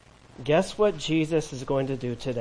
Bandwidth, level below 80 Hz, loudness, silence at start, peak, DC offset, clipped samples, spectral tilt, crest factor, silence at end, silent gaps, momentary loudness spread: 10.5 kHz; -50 dBFS; -26 LUFS; 0.4 s; -10 dBFS; under 0.1%; under 0.1%; -6 dB/octave; 16 dB; 0 s; none; 7 LU